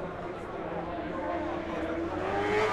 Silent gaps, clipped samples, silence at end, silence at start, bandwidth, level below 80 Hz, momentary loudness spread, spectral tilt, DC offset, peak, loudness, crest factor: none; under 0.1%; 0 s; 0 s; 12 kHz; -52 dBFS; 8 LU; -6 dB/octave; under 0.1%; -16 dBFS; -33 LUFS; 16 dB